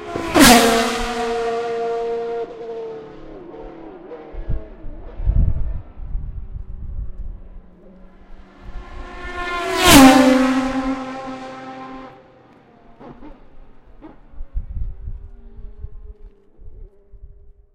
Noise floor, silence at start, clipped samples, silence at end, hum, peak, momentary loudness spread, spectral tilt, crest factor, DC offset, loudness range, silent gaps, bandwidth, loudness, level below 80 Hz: -48 dBFS; 0 s; under 0.1%; 0.25 s; none; 0 dBFS; 28 LU; -3.5 dB/octave; 20 dB; under 0.1%; 23 LU; none; 16 kHz; -15 LUFS; -30 dBFS